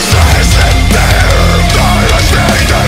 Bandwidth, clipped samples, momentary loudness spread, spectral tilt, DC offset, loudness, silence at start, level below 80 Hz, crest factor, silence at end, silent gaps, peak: 16.5 kHz; 0.9%; 1 LU; -4 dB/octave; under 0.1%; -8 LUFS; 0 s; -12 dBFS; 6 dB; 0 s; none; 0 dBFS